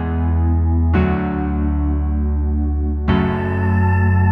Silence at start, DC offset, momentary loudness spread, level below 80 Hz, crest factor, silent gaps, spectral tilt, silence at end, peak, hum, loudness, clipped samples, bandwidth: 0 s; under 0.1%; 4 LU; -22 dBFS; 14 dB; none; -10.5 dB/octave; 0 s; -2 dBFS; none; -18 LUFS; under 0.1%; 4.2 kHz